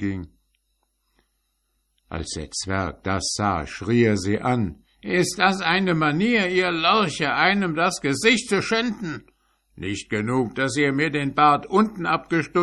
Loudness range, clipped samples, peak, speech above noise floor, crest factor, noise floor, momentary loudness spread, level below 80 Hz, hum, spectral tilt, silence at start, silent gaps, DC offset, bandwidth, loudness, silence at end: 7 LU; under 0.1%; -2 dBFS; 50 dB; 20 dB; -72 dBFS; 12 LU; -48 dBFS; none; -4.5 dB/octave; 0 s; none; under 0.1%; 13 kHz; -22 LUFS; 0 s